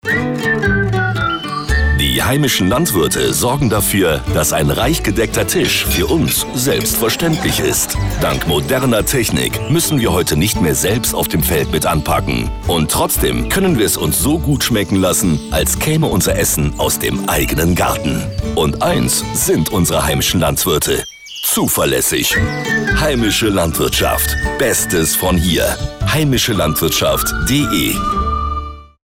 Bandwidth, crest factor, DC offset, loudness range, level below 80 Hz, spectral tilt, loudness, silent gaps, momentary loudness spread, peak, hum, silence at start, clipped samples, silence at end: 18 kHz; 10 dB; under 0.1%; 1 LU; -26 dBFS; -4 dB/octave; -14 LUFS; none; 4 LU; -6 dBFS; none; 0.05 s; under 0.1%; 0.2 s